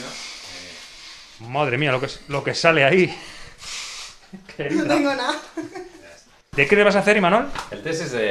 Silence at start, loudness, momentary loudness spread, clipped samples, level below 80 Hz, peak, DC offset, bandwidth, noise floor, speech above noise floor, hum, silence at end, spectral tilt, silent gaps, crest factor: 0 s; -20 LUFS; 22 LU; under 0.1%; -50 dBFS; 0 dBFS; under 0.1%; 13.5 kHz; -48 dBFS; 28 dB; none; 0 s; -4.5 dB/octave; none; 22 dB